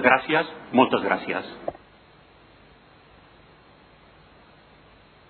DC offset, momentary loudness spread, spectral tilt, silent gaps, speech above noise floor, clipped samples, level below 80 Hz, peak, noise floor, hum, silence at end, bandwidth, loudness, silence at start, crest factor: under 0.1%; 16 LU; -8.5 dB/octave; none; 31 dB; under 0.1%; -62 dBFS; -2 dBFS; -53 dBFS; none; 3.6 s; 4.5 kHz; -23 LUFS; 0 s; 26 dB